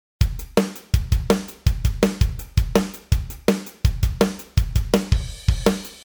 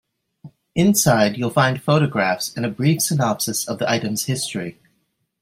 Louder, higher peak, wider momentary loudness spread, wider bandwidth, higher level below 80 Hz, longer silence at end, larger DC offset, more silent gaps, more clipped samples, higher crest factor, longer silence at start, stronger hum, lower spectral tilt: second, -23 LUFS vs -19 LUFS; about the same, -2 dBFS vs -2 dBFS; second, 4 LU vs 9 LU; first, over 20 kHz vs 16 kHz; first, -26 dBFS vs -56 dBFS; second, 0 s vs 0.7 s; neither; neither; neither; about the same, 20 dB vs 18 dB; second, 0.2 s vs 0.45 s; neither; first, -6 dB/octave vs -4.5 dB/octave